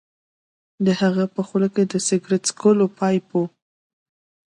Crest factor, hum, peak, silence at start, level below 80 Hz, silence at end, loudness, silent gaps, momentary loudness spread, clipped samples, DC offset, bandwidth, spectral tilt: 18 dB; none; -4 dBFS; 0.8 s; -68 dBFS; 1 s; -21 LUFS; none; 6 LU; under 0.1%; under 0.1%; 11.5 kHz; -5.5 dB/octave